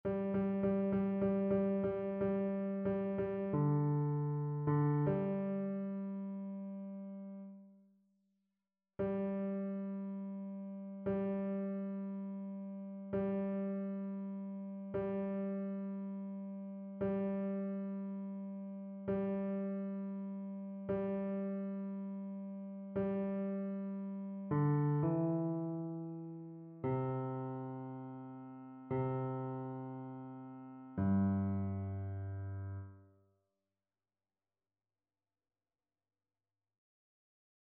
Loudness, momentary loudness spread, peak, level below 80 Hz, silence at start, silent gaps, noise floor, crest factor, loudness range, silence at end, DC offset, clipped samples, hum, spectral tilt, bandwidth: -39 LUFS; 13 LU; -24 dBFS; -70 dBFS; 0.05 s; none; under -90 dBFS; 16 dB; 8 LU; 4.55 s; under 0.1%; under 0.1%; none; -10.5 dB/octave; 3.4 kHz